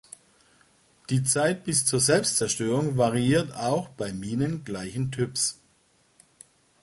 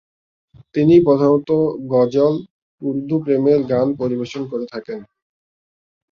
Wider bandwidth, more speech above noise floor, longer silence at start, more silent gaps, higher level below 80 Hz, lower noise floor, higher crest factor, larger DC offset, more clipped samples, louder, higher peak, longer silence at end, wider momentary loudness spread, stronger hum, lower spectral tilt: first, 12 kHz vs 7 kHz; second, 39 dB vs over 74 dB; first, 1.1 s vs 0.75 s; second, none vs 2.50-2.78 s; about the same, -58 dBFS vs -56 dBFS; second, -65 dBFS vs under -90 dBFS; about the same, 20 dB vs 16 dB; neither; neither; second, -25 LUFS vs -17 LUFS; second, -8 dBFS vs -2 dBFS; first, 1.3 s vs 1.1 s; second, 10 LU vs 15 LU; neither; second, -4 dB/octave vs -9 dB/octave